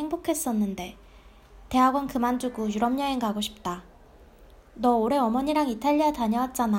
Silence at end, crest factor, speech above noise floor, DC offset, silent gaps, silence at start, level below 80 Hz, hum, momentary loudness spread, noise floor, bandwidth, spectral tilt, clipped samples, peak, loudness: 0 s; 18 dB; 27 dB; under 0.1%; none; 0 s; -52 dBFS; none; 8 LU; -52 dBFS; 16 kHz; -5 dB/octave; under 0.1%; -8 dBFS; -26 LUFS